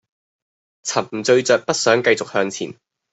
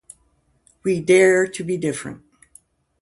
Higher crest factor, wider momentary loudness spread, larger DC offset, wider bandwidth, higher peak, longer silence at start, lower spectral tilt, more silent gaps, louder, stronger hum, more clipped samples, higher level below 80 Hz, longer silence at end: about the same, 18 dB vs 18 dB; second, 13 LU vs 16 LU; neither; second, 8.4 kHz vs 11.5 kHz; about the same, -2 dBFS vs -4 dBFS; about the same, 0.85 s vs 0.85 s; second, -3 dB/octave vs -5 dB/octave; neither; about the same, -18 LUFS vs -19 LUFS; neither; neither; second, -66 dBFS vs -60 dBFS; second, 0.4 s vs 0.85 s